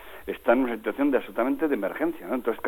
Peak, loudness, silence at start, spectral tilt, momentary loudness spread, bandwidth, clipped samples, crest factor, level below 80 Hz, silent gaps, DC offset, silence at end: -8 dBFS; -26 LUFS; 0 s; -6.5 dB/octave; 6 LU; 17.5 kHz; under 0.1%; 18 dB; -58 dBFS; none; under 0.1%; 0 s